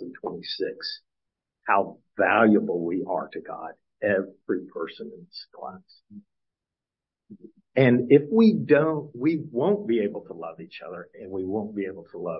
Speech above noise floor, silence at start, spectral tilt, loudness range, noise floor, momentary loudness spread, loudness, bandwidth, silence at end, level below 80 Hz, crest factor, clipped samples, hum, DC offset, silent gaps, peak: 65 dB; 0 s; -10.5 dB/octave; 10 LU; -90 dBFS; 21 LU; -24 LUFS; 5.8 kHz; 0 s; -72 dBFS; 22 dB; under 0.1%; none; under 0.1%; none; -4 dBFS